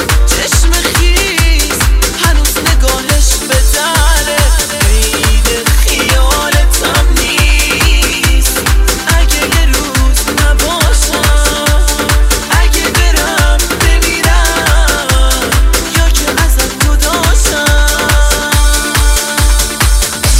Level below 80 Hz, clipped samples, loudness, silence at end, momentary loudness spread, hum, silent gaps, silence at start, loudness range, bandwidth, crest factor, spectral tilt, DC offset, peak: -10 dBFS; 0.1%; -10 LUFS; 0 s; 1 LU; none; none; 0 s; 1 LU; 16.5 kHz; 8 dB; -3 dB/octave; under 0.1%; 0 dBFS